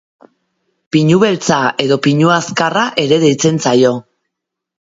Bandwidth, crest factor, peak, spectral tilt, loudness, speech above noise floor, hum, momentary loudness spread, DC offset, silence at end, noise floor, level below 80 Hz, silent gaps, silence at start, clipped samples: 7.8 kHz; 14 dB; 0 dBFS; -5 dB/octave; -12 LUFS; 67 dB; none; 4 LU; under 0.1%; 0.85 s; -79 dBFS; -56 dBFS; none; 0.95 s; under 0.1%